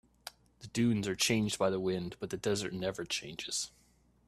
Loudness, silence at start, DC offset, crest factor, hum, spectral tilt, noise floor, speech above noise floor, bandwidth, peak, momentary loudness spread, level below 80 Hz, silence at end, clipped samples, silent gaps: -34 LUFS; 0.25 s; under 0.1%; 20 dB; none; -4 dB/octave; -53 dBFS; 20 dB; 14 kHz; -16 dBFS; 16 LU; -64 dBFS; 0.6 s; under 0.1%; none